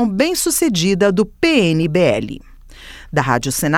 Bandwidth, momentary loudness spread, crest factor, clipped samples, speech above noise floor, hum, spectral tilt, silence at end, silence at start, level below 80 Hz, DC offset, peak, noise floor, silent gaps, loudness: 18 kHz; 8 LU; 16 dB; under 0.1%; 22 dB; none; -4.5 dB/octave; 0 s; 0 s; -40 dBFS; under 0.1%; 0 dBFS; -38 dBFS; none; -16 LUFS